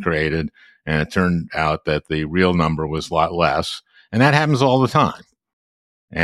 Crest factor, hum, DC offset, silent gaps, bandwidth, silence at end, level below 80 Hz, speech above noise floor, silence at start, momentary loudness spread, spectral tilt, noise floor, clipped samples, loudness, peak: 18 dB; none; under 0.1%; 5.53-6.08 s; 12.5 kHz; 0 s; -44 dBFS; over 71 dB; 0 s; 12 LU; -6.5 dB/octave; under -90 dBFS; under 0.1%; -19 LUFS; -2 dBFS